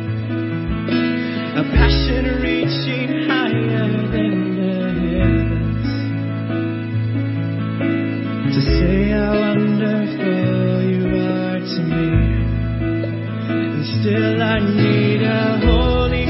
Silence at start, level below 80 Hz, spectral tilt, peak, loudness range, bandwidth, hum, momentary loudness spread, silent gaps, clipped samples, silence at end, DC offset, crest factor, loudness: 0 s; -26 dBFS; -11 dB/octave; -2 dBFS; 3 LU; 5.8 kHz; none; 6 LU; none; under 0.1%; 0 s; under 0.1%; 16 dB; -18 LUFS